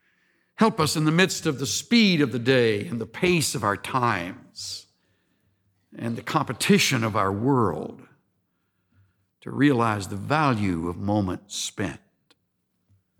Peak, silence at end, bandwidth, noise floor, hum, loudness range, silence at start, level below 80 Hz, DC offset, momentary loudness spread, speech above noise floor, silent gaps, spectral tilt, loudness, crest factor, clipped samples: -6 dBFS; 1.2 s; 18.5 kHz; -74 dBFS; none; 5 LU; 0.6 s; -58 dBFS; under 0.1%; 15 LU; 51 dB; none; -4.5 dB/octave; -23 LUFS; 18 dB; under 0.1%